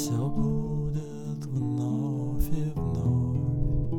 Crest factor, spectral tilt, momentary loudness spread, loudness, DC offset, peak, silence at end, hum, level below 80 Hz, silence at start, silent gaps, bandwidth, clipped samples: 14 dB; -8 dB/octave; 6 LU; -29 LUFS; under 0.1%; -14 dBFS; 0 s; none; -36 dBFS; 0 s; none; 17.5 kHz; under 0.1%